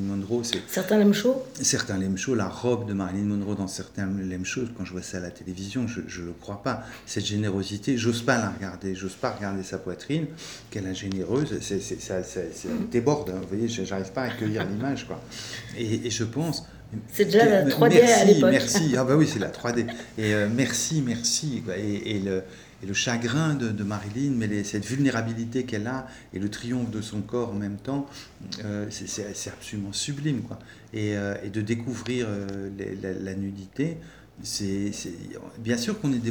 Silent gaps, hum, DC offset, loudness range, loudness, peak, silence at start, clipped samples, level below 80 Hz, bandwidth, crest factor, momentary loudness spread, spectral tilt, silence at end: none; none; under 0.1%; 12 LU; -26 LUFS; -4 dBFS; 0 s; under 0.1%; -56 dBFS; over 20 kHz; 22 dB; 14 LU; -5 dB/octave; 0 s